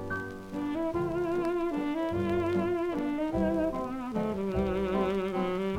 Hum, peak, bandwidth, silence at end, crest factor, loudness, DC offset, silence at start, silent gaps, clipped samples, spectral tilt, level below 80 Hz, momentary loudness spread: none; -16 dBFS; 15.5 kHz; 0 s; 14 dB; -31 LUFS; under 0.1%; 0 s; none; under 0.1%; -7.5 dB/octave; -48 dBFS; 5 LU